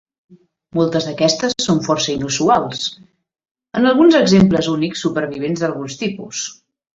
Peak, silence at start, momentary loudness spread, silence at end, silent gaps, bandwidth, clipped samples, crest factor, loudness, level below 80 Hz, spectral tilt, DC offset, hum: -2 dBFS; 0.3 s; 14 LU; 0.4 s; 3.51-3.55 s; 8 kHz; under 0.1%; 16 dB; -17 LUFS; -50 dBFS; -5 dB/octave; under 0.1%; none